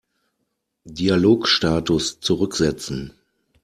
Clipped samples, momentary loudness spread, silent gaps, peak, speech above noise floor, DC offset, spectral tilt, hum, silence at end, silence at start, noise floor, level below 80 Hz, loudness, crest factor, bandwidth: under 0.1%; 14 LU; none; -4 dBFS; 55 dB; under 0.1%; -4.5 dB/octave; none; 0.55 s; 0.85 s; -75 dBFS; -46 dBFS; -20 LUFS; 18 dB; 13.5 kHz